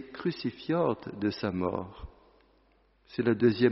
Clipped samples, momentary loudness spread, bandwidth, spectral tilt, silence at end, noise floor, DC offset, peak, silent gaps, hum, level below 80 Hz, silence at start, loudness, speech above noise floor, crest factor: under 0.1%; 16 LU; 5.8 kHz; -6 dB/octave; 0 s; -66 dBFS; under 0.1%; -10 dBFS; none; none; -56 dBFS; 0 s; -30 LUFS; 37 dB; 20 dB